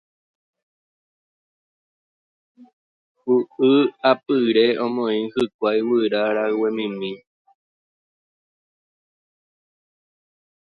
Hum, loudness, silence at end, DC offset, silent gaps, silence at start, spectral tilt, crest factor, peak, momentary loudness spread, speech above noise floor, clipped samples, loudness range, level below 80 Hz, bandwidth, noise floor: none; -20 LUFS; 3.55 s; under 0.1%; 2.73-3.15 s, 5.54-5.59 s; 2.6 s; -7 dB/octave; 20 dB; -4 dBFS; 10 LU; over 70 dB; under 0.1%; 11 LU; -70 dBFS; 6.8 kHz; under -90 dBFS